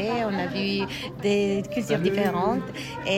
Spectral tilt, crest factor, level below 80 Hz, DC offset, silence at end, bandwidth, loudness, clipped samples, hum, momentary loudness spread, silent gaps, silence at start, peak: -5.5 dB/octave; 14 dB; -52 dBFS; under 0.1%; 0 s; 16 kHz; -26 LUFS; under 0.1%; none; 7 LU; none; 0 s; -10 dBFS